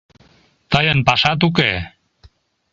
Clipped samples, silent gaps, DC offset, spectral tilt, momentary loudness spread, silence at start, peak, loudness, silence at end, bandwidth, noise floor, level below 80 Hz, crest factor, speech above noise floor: under 0.1%; none; under 0.1%; -5.5 dB/octave; 9 LU; 0.7 s; 0 dBFS; -16 LUFS; 0.85 s; 7.6 kHz; -54 dBFS; -42 dBFS; 20 dB; 38 dB